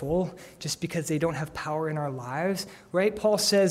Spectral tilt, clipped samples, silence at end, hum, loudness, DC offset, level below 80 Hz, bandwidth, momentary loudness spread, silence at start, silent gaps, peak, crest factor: -4.5 dB/octave; under 0.1%; 0 s; none; -28 LUFS; under 0.1%; -54 dBFS; 16 kHz; 10 LU; 0 s; none; -12 dBFS; 14 dB